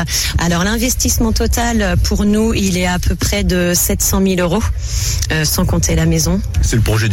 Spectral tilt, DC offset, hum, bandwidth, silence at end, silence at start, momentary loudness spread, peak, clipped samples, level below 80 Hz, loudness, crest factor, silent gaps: -4 dB/octave; under 0.1%; none; 18 kHz; 0 s; 0 s; 3 LU; -4 dBFS; under 0.1%; -20 dBFS; -15 LUFS; 10 dB; none